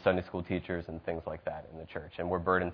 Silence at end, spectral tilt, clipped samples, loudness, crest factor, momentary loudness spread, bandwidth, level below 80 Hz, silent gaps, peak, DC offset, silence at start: 0 s; -5.5 dB/octave; under 0.1%; -36 LUFS; 22 dB; 13 LU; 5.4 kHz; -56 dBFS; none; -12 dBFS; under 0.1%; 0 s